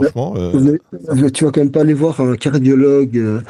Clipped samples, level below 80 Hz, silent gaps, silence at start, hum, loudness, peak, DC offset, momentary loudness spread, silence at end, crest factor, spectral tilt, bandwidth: under 0.1%; -52 dBFS; none; 0 s; none; -14 LUFS; -2 dBFS; under 0.1%; 6 LU; 0.05 s; 12 dB; -7.5 dB/octave; 11.5 kHz